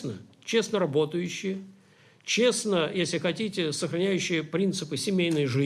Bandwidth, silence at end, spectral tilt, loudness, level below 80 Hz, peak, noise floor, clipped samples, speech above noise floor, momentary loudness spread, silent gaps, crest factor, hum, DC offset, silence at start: 13.5 kHz; 0 s; -4.5 dB/octave; -27 LUFS; -72 dBFS; -12 dBFS; -58 dBFS; under 0.1%; 31 dB; 9 LU; none; 16 dB; none; under 0.1%; 0 s